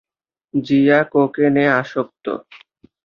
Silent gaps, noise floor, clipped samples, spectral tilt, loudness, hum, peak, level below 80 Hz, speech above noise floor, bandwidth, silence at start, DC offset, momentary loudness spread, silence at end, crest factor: none; -61 dBFS; under 0.1%; -8 dB/octave; -17 LUFS; none; -2 dBFS; -62 dBFS; 45 dB; 6.6 kHz; 0.55 s; under 0.1%; 13 LU; 0.65 s; 16 dB